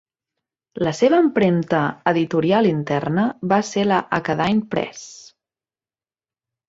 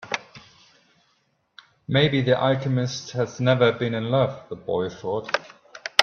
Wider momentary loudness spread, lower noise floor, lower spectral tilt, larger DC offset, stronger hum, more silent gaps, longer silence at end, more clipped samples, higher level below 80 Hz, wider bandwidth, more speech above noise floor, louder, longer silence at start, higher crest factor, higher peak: about the same, 9 LU vs 11 LU; first, under -90 dBFS vs -68 dBFS; about the same, -6.5 dB/octave vs -5.5 dB/octave; neither; neither; neither; first, 1.5 s vs 0 s; neither; about the same, -58 dBFS vs -60 dBFS; second, 7.8 kHz vs 9.2 kHz; first, over 71 dB vs 45 dB; first, -19 LUFS vs -23 LUFS; first, 0.75 s vs 0 s; second, 18 dB vs 24 dB; about the same, -2 dBFS vs 0 dBFS